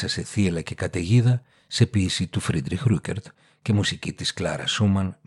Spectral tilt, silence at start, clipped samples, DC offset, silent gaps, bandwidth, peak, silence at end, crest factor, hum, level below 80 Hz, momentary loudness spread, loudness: -5.5 dB/octave; 0 s; under 0.1%; under 0.1%; none; 12 kHz; -6 dBFS; 0.15 s; 18 dB; none; -50 dBFS; 8 LU; -24 LUFS